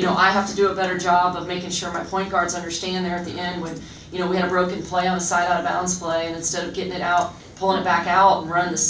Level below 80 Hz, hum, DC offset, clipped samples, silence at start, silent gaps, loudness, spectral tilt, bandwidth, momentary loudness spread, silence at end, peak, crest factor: -50 dBFS; none; under 0.1%; under 0.1%; 0 s; none; -21 LUFS; -3.5 dB/octave; 8 kHz; 10 LU; 0 s; -4 dBFS; 18 dB